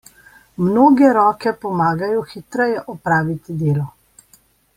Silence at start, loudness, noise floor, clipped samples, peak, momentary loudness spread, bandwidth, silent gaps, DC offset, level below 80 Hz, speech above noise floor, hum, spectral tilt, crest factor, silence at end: 0.6 s; -17 LUFS; -55 dBFS; under 0.1%; -2 dBFS; 12 LU; 15.5 kHz; none; under 0.1%; -54 dBFS; 38 dB; none; -8 dB/octave; 16 dB; 0.85 s